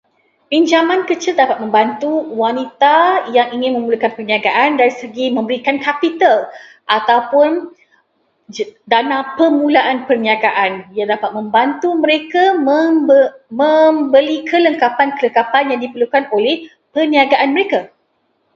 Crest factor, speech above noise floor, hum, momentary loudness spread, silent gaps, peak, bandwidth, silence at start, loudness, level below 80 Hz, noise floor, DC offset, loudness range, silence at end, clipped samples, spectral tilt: 14 dB; 49 dB; none; 7 LU; none; 0 dBFS; 7.4 kHz; 0.5 s; -14 LUFS; -66 dBFS; -63 dBFS; under 0.1%; 3 LU; 0.7 s; under 0.1%; -4 dB/octave